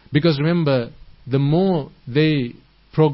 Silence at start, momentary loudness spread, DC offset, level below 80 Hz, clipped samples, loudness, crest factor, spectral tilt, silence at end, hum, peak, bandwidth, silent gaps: 0.1 s; 8 LU; under 0.1%; -50 dBFS; under 0.1%; -19 LUFS; 14 dB; -12 dB/octave; 0 s; none; -4 dBFS; 5.8 kHz; none